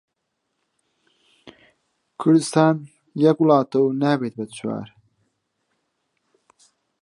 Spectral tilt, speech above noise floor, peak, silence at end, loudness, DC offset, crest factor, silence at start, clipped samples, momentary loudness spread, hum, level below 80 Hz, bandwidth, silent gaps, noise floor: -6.5 dB/octave; 58 dB; -2 dBFS; 2.15 s; -20 LUFS; under 0.1%; 22 dB; 2.2 s; under 0.1%; 13 LU; none; -72 dBFS; 11.5 kHz; none; -77 dBFS